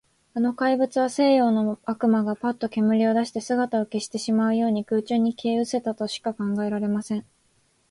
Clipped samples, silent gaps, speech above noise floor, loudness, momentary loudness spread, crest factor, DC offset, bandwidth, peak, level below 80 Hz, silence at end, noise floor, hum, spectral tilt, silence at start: under 0.1%; none; 42 dB; -24 LUFS; 8 LU; 14 dB; under 0.1%; 11.5 kHz; -8 dBFS; -68 dBFS; 0.7 s; -65 dBFS; none; -5.5 dB/octave; 0.35 s